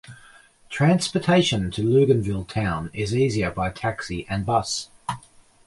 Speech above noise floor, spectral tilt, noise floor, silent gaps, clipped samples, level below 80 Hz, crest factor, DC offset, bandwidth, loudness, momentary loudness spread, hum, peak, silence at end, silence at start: 30 dB; -5.5 dB/octave; -51 dBFS; none; under 0.1%; -46 dBFS; 18 dB; under 0.1%; 11.5 kHz; -23 LUFS; 12 LU; none; -6 dBFS; 0.5 s; 0.1 s